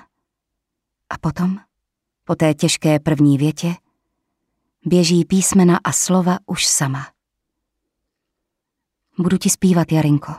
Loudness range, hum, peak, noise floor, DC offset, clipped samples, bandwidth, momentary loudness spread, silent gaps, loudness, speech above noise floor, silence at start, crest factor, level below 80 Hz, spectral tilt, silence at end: 5 LU; none; -4 dBFS; -80 dBFS; under 0.1%; under 0.1%; 15 kHz; 13 LU; none; -17 LUFS; 64 dB; 1.1 s; 16 dB; -50 dBFS; -5 dB/octave; 0 s